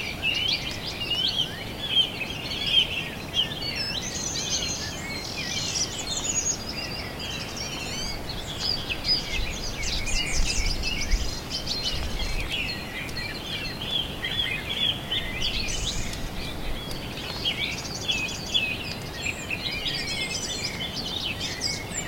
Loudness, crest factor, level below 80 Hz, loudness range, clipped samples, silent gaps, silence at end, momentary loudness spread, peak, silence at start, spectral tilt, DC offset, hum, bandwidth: -27 LUFS; 20 dB; -36 dBFS; 4 LU; under 0.1%; none; 0 s; 8 LU; -8 dBFS; 0 s; -2 dB/octave; under 0.1%; none; 16.5 kHz